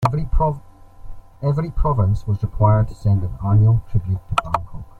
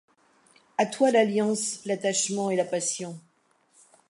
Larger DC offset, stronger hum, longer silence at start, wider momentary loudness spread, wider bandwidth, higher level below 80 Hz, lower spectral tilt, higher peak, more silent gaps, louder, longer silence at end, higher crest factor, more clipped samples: neither; neither; second, 0 s vs 0.8 s; second, 8 LU vs 13 LU; second, 8.6 kHz vs 11.5 kHz; first, -28 dBFS vs -80 dBFS; first, -8.5 dB/octave vs -3.5 dB/octave; first, -2 dBFS vs -8 dBFS; neither; first, -20 LUFS vs -26 LUFS; second, 0 s vs 0.9 s; about the same, 16 dB vs 20 dB; neither